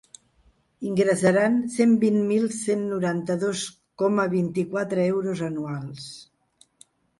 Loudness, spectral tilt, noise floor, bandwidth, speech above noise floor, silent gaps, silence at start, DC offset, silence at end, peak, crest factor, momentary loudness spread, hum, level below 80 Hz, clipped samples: -24 LUFS; -6 dB/octave; -62 dBFS; 11.5 kHz; 39 dB; none; 0.8 s; under 0.1%; 0.95 s; -8 dBFS; 16 dB; 14 LU; none; -64 dBFS; under 0.1%